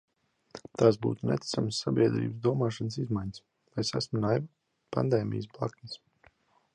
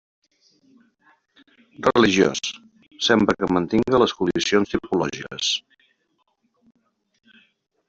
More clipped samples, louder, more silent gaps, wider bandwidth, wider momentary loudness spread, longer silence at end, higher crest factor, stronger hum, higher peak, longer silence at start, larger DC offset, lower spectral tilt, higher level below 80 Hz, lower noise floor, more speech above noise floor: neither; second, -30 LUFS vs -21 LUFS; neither; first, 11 kHz vs 8 kHz; first, 19 LU vs 10 LU; second, 0.8 s vs 2.3 s; about the same, 22 dB vs 20 dB; neither; second, -10 dBFS vs -4 dBFS; second, 0.55 s vs 1.8 s; neither; first, -6.5 dB/octave vs -4 dB/octave; second, -62 dBFS vs -54 dBFS; second, -64 dBFS vs -70 dBFS; second, 35 dB vs 50 dB